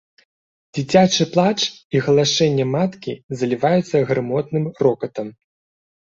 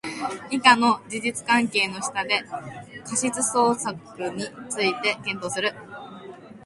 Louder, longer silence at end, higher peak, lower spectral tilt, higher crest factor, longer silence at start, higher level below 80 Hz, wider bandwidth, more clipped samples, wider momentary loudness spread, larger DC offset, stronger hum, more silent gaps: first, -19 LUFS vs -23 LUFS; first, 0.8 s vs 0 s; about the same, -2 dBFS vs 0 dBFS; first, -5 dB/octave vs -2.5 dB/octave; second, 18 dB vs 24 dB; first, 0.75 s vs 0.05 s; first, -58 dBFS vs -66 dBFS; second, 7.8 kHz vs 11.5 kHz; neither; second, 13 LU vs 19 LU; neither; neither; first, 1.85-1.90 s, 3.24-3.29 s vs none